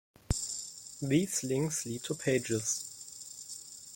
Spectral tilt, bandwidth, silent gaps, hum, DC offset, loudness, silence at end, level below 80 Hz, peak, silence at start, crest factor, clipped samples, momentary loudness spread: -4 dB/octave; 17 kHz; none; none; under 0.1%; -33 LUFS; 0 s; -52 dBFS; -16 dBFS; 0.3 s; 20 dB; under 0.1%; 13 LU